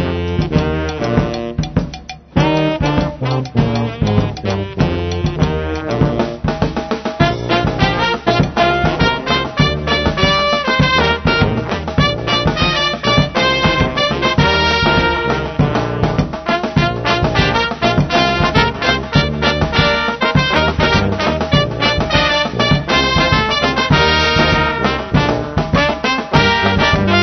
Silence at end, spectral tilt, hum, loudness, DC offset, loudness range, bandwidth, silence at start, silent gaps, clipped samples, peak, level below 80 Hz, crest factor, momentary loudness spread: 0 s; -5.5 dB/octave; none; -15 LUFS; 0.1%; 4 LU; 6.4 kHz; 0 s; none; under 0.1%; 0 dBFS; -28 dBFS; 14 dB; 6 LU